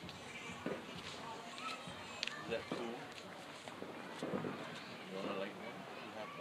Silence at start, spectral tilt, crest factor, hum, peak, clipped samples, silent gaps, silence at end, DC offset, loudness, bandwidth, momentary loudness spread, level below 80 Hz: 0 s; -4 dB/octave; 30 dB; none; -16 dBFS; under 0.1%; none; 0 s; under 0.1%; -46 LUFS; 15.5 kHz; 6 LU; -78 dBFS